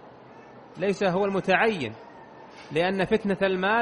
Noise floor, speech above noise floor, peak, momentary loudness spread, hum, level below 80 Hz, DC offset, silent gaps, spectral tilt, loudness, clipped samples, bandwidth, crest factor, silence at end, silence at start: -48 dBFS; 23 dB; -6 dBFS; 23 LU; none; -58 dBFS; under 0.1%; none; -6 dB/octave; -25 LUFS; under 0.1%; 10.5 kHz; 20 dB; 0 s; 0.05 s